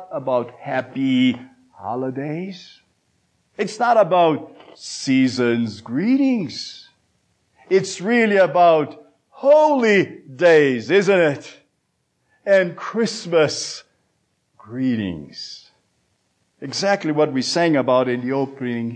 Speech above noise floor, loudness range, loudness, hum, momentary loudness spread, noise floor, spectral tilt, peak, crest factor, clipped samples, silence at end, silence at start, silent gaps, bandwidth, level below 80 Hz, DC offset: 52 dB; 8 LU; -19 LUFS; none; 17 LU; -70 dBFS; -5 dB/octave; -4 dBFS; 16 dB; under 0.1%; 0 s; 0 s; none; 9.4 kHz; -68 dBFS; under 0.1%